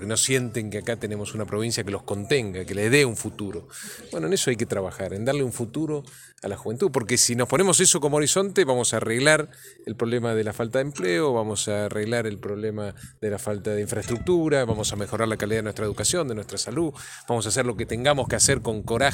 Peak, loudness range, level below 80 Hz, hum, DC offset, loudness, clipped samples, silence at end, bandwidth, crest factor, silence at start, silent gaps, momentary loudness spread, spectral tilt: -4 dBFS; 6 LU; -52 dBFS; none; under 0.1%; -24 LUFS; under 0.1%; 0 s; 17 kHz; 22 dB; 0 s; none; 12 LU; -3.5 dB/octave